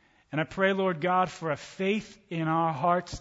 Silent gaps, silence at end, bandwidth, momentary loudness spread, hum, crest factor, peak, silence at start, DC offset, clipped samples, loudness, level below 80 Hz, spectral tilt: none; 0 s; 8 kHz; 8 LU; none; 16 dB; -12 dBFS; 0.3 s; under 0.1%; under 0.1%; -28 LUFS; -58 dBFS; -6 dB/octave